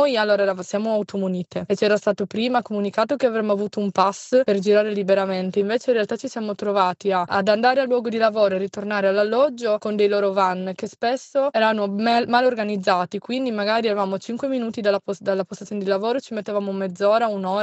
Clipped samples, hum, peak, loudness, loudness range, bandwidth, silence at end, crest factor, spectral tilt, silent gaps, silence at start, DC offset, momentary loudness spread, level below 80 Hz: under 0.1%; none; -4 dBFS; -21 LUFS; 3 LU; 8.4 kHz; 0 s; 16 dB; -5.5 dB/octave; none; 0 s; under 0.1%; 7 LU; -70 dBFS